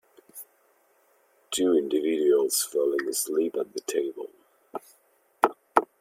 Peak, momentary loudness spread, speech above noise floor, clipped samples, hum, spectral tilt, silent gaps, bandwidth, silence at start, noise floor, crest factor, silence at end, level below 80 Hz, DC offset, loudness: -2 dBFS; 19 LU; 39 dB; under 0.1%; none; -2 dB/octave; none; 16.5 kHz; 0.35 s; -65 dBFS; 26 dB; 0.15 s; -76 dBFS; under 0.1%; -26 LUFS